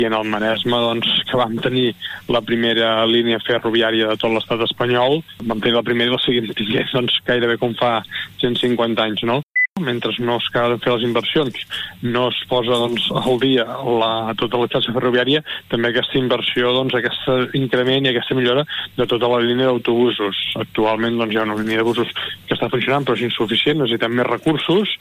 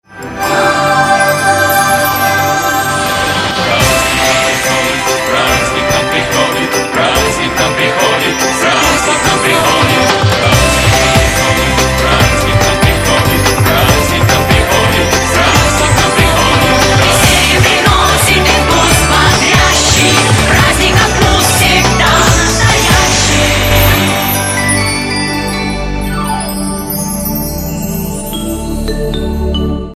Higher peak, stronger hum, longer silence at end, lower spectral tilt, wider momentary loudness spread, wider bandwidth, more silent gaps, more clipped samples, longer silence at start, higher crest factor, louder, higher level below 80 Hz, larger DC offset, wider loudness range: second, -4 dBFS vs 0 dBFS; neither; about the same, 0.05 s vs 0.05 s; first, -6 dB/octave vs -3.5 dB/octave; second, 5 LU vs 9 LU; about the same, 15.5 kHz vs 16.5 kHz; first, 9.43-9.51 s, 9.69-9.75 s vs none; second, under 0.1% vs 0.4%; about the same, 0 s vs 0.1 s; about the same, 14 dB vs 10 dB; second, -18 LUFS vs -9 LUFS; second, -52 dBFS vs -22 dBFS; neither; second, 2 LU vs 6 LU